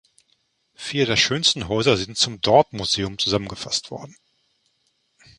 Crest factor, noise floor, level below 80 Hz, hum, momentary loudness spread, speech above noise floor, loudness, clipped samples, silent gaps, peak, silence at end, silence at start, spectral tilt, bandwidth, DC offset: 22 dB; -69 dBFS; -50 dBFS; none; 10 LU; 47 dB; -20 LUFS; under 0.1%; none; -2 dBFS; 1.3 s; 0.8 s; -3.5 dB/octave; 11.5 kHz; under 0.1%